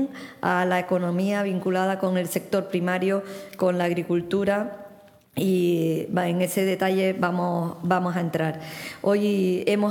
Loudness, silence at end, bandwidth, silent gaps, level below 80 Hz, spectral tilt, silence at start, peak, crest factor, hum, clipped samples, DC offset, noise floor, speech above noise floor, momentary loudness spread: -24 LUFS; 0 s; 18.5 kHz; none; -68 dBFS; -6.5 dB/octave; 0 s; -6 dBFS; 18 dB; none; under 0.1%; under 0.1%; -50 dBFS; 26 dB; 6 LU